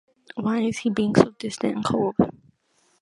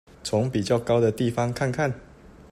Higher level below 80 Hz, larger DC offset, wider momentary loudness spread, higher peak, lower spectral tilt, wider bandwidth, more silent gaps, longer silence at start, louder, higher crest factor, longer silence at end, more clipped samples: about the same, -56 dBFS vs -52 dBFS; neither; about the same, 8 LU vs 6 LU; first, 0 dBFS vs -8 dBFS; about the same, -6.5 dB/octave vs -6 dB/octave; second, 11.5 kHz vs 14 kHz; neither; about the same, 0.35 s vs 0.25 s; about the same, -23 LUFS vs -25 LUFS; first, 24 dB vs 16 dB; first, 0.7 s vs 0.25 s; neither